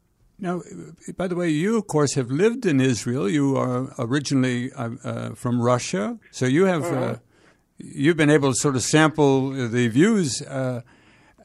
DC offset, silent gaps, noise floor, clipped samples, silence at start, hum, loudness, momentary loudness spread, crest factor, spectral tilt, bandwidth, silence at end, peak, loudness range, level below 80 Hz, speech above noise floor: under 0.1%; none; -58 dBFS; under 0.1%; 0.4 s; none; -22 LUFS; 12 LU; 18 dB; -5.5 dB/octave; 13.5 kHz; 0.6 s; -4 dBFS; 4 LU; -60 dBFS; 37 dB